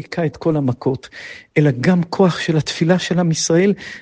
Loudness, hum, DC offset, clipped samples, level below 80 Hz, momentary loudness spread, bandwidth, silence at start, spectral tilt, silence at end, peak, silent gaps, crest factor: -17 LUFS; none; under 0.1%; under 0.1%; -52 dBFS; 8 LU; 9.6 kHz; 0 s; -5.5 dB/octave; 0 s; -2 dBFS; none; 16 dB